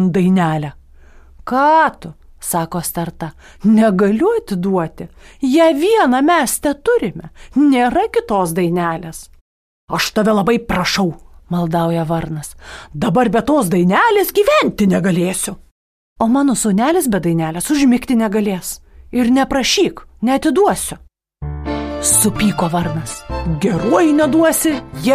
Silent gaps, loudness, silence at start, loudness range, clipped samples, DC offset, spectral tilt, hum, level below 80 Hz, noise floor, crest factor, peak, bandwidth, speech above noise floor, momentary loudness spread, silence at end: 9.41-9.88 s, 15.71-16.16 s; -15 LUFS; 0 s; 3 LU; under 0.1%; under 0.1%; -5 dB/octave; none; -38 dBFS; -42 dBFS; 14 dB; -2 dBFS; 15.5 kHz; 27 dB; 14 LU; 0 s